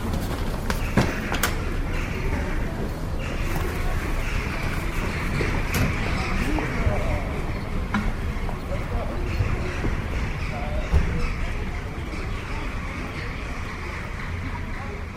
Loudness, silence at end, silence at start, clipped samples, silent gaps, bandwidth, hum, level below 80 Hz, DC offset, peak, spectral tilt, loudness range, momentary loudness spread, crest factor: -28 LUFS; 0 s; 0 s; under 0.1%; none; 16 kHz; none; -28 dBFS; under 0.1%; -6 dBFS; -5.5 dB/octave; 3 LU; 7 LU; 20 dB